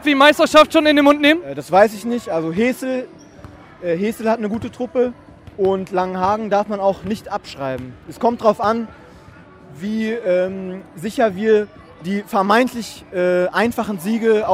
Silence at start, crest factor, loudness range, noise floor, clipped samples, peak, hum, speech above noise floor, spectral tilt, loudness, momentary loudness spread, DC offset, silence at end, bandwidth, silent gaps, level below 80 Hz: 0 s; 18 dB; 6 LU; -43 dBFS; under 0.1%; 0 dBFS; none; 25 dB; -5 dB/octave; -18 LUFS; 16 LU; under 0.1%; 0 s; 16 kHz; none; -52 dBFS